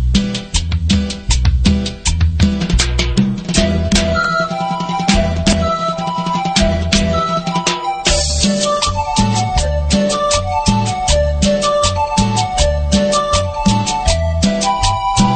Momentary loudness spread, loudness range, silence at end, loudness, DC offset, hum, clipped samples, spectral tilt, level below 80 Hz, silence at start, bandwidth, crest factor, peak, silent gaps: 3 LU; 1 LU; 0 s; -15 LUFS; 0.2%; none; under 0.1%; -4.5 dB/octave; -20 dBFS; 0 s; 9.4 kHz; 14 dB; 0 dBFS; none